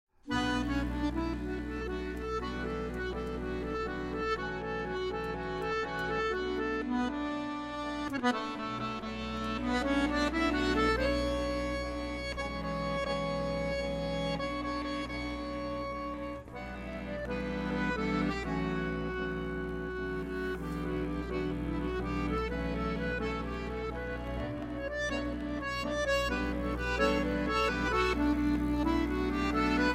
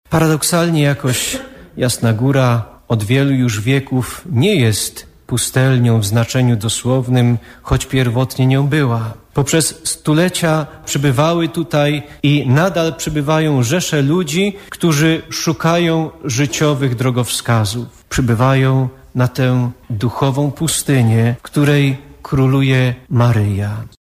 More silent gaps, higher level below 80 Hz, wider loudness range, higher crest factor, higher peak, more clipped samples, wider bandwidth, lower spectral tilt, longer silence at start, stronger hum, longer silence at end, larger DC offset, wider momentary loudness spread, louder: neither; about the same, -42 dBFS vs -40 dBFS; first, 5 LU vs 1 LU; first, 18 dB vs 12 dB; second, -14 dBFS vs -4 dBFS; neither; second, 14 kHz vs 16 kHz; about the same, -6 dB/octave vs -5.5 dB/octave; first, 0.25 s vs 0.1 s; neither; second, 0 s vs 0.15 s; neither; about the same, 8 LU vs 7 LU; second, -34 LUFS vs -15 LUFS